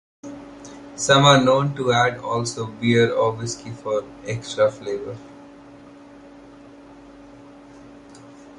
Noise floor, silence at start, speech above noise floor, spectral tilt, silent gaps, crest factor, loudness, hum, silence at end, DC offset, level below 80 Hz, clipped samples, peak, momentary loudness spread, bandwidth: -44 dBFS; 0.25 s; 24 dB; -4.5 dB/octave; none; 22 dB; -20 LUFS; none; 0.05 s; under 0.1%; -56 dBFS; under 0.1%; -2 dBFS; 24 LU; 11.5 kHz